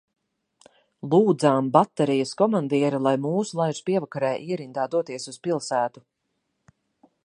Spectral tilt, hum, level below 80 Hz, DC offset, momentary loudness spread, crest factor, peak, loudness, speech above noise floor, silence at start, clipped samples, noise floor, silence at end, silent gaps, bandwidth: -6 dB/octave; none; -74 dBFS; under 0.1%; 10 LU; 22 dB; -2 dBFS; -24 LUFS; 53 dB; 1.05 s; under 0.1%; -76 dBFS; 1.3 s; none; 10.5 kHz